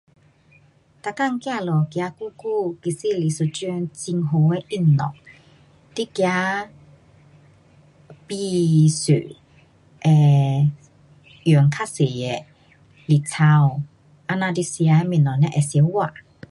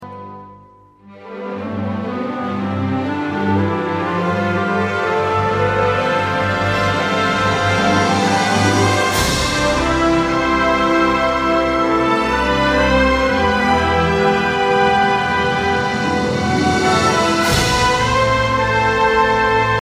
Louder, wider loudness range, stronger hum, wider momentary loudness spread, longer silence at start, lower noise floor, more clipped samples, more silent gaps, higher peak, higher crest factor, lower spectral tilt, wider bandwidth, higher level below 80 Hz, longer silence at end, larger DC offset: second, -20 LUFS vs -16 LUFS; about the same, 5 LU vs 5 LU; neither; first, 13 LU vs 7 LU; first, 1.05 s vs 0 s; first, -55 dBFS vs -45 dBFS; neither; neither; second, -6 dBFS vs -2 dBFS; about the same, 16 dB vs 14 dB; first, -6.5 dB/octave vs -4.5 dB/octave; second, 11.5 kHz vs 15.5 kHz; second, -60 dBFS vs -34 dBFS; first, 0.4 s vs 0 s; neither